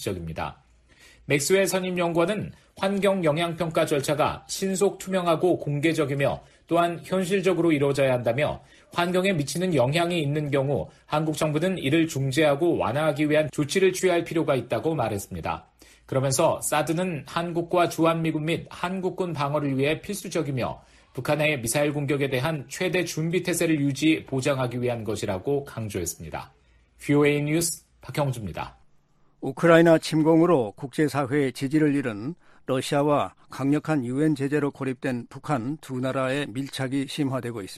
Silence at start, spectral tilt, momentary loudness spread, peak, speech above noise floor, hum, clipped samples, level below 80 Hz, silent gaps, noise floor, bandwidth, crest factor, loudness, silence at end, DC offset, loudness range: 0 s; -5.5 dB/octave; 10 LU; -4 dBFS; 35 dB; none; under 0.1%; -56 dBFS; none; -60 dBFS; 15 kHz; 22 dB; -25 LUFS; 0 s; under 0.1%; 4 LU